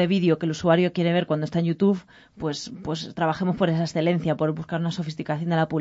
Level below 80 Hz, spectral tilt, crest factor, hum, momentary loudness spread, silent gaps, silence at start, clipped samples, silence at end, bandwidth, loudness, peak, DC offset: -58 dBFS; -7 dB/octave; 18 dB; none; 10 LU; none; 0 s; under 0.1%; 0 s; 8 kHz; -24 LUFS; -6 dBFS; under 0.1%